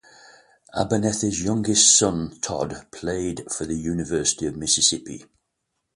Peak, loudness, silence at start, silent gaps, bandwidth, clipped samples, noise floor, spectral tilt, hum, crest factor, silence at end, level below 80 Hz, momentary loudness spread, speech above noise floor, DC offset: -2 dBFS; -21 LUFS; 0.75 s; none; 11.5 kHz; under 0.1%; -78 dBFS; -3 dB/octave; none; 22 dB; 0.7 s; -48 dBFS; 16 LU; 55 dB; under 0.1%